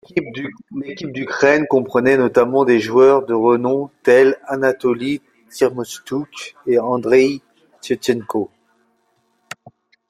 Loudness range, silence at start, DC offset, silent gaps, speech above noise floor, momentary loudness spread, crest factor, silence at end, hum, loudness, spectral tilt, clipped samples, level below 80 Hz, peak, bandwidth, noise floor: 6 LU; 0.15 s; under 0.1%; none; 48 dB; 18 LU; 16 dB; 1.65 s; none; -17 LUFS; -5.5 dB/octave; under 0.1%; -60 dBFS; -2 dBFS; 14 kHz; -64 dBFS